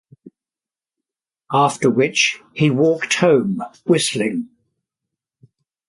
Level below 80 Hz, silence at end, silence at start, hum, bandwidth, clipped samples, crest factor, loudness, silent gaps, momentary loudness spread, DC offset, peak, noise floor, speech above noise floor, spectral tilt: -64 dBFS; 1.4 s; 0.25 s; none; 11.5 kHz; under 0.1%; 18 dB; -17 LUFS; none; 9 LU; under 0.1%; -2 dBFS; under -90 dBFS; over 73 dB; -4.5 dB/octave